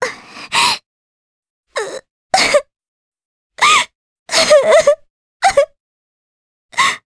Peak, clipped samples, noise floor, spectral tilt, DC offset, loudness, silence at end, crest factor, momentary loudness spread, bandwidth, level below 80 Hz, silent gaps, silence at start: 0 dBFS; under 0.1%; under -90 dBFS; -0.5 dB/octave; under 0.1%; -14 LUFS; 0.1 s; 16 dB; 14 LU; 11 kHz; -52 dBFS; 0.86-1.43 s, 1.50-1.63 s, 2.11-2.30 s, 2.88-3.12 s, 3.25-3.50 s, 3.95-4.26 s, 5.10-5.40 s, 5.80-6.69 s; 0 s